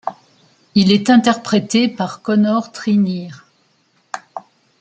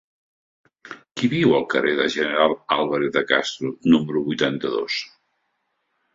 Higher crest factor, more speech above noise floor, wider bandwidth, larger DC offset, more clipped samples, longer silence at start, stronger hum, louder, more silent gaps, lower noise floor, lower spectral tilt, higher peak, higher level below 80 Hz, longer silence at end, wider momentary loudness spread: about the same, 16 dB vs 20 dB; second, 45 dB vs 52 dB; first, 9 kHz vs 7.8 kHz; neither; neither; second, 0.05 s vs 0.85 s; neither; first, -16 LUFS vs -21 LUFS; neither; second, -60 dBFS vs -73 dBFS; about the same, -5.5 dB/octave vs -5 dB/octave; about the same, -2 dBFS vs -2 dBFS; about the same, -60 dBFS vs -60 dBFS; second, 0.4 s vs 1.1 s; first, 20 LU vs 9 LU